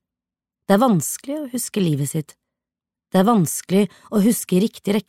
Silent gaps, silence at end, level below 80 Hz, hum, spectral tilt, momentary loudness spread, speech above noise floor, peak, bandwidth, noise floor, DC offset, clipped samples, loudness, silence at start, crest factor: none; 0.05 s; -64 dBFS; none; -5.5 dB/octave; 11 LU; 69 dB; -2 dBFS; 16.5 kHz; -88 dBFS; under 0.1%; under 0.1%; -20 LUFS; 0.7 s; 18 dB